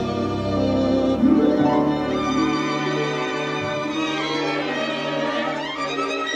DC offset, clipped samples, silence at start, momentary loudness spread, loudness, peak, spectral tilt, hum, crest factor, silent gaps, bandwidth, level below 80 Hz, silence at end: under 0.1%; under 0.1%; 0 s; 7 LU; -22 LUFS; -6 dBFS; -5.5 dB/octave; none; 16 dB; none; 9.4 kHz; -46 dBFS; 0 s